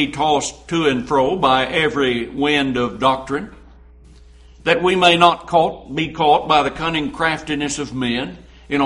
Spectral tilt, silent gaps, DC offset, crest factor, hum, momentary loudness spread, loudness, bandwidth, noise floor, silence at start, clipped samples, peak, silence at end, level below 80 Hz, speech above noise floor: -4 dB/octave; none; under 0.1%; 18 dB; none; 10 LU; -17 LUFS; 11.5 kHz; -44 dBFS; 0 s; under 0.1%; 0 dBFS; 0 s; -44 dBFS; 26 dB